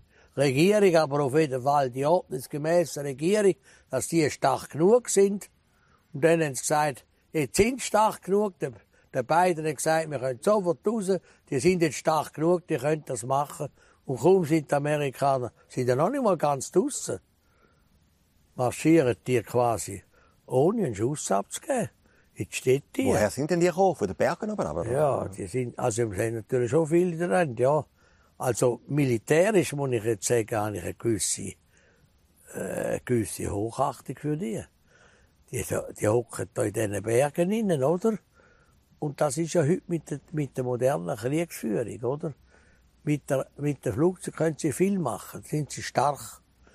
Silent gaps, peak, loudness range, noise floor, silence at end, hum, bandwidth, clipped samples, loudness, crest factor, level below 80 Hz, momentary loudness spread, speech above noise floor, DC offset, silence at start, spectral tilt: none; -8 dBFS; 5 LU; -64 dBFS; 0.4 s; none; 15 kHz; under 0.1%; -26 LUFS; 20 dB; -58 dBFS; 11 LU; 38 dB; under 0.1%; 0.35 s; -5.5 dB/octave